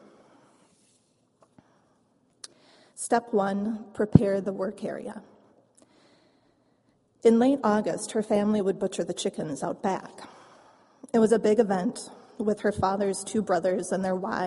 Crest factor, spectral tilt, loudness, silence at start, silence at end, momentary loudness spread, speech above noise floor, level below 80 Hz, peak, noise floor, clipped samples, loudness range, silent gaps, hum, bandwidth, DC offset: 28 dB; -6 dB/octave; -26 LUFS; 2.95 s; 0 s; 19 LU; 42 dB; -56 dBFS; 0 dBFS; -67 dBFS; under 0.1%; 6 LU; none; none; 11.5 kHz; under 0.1%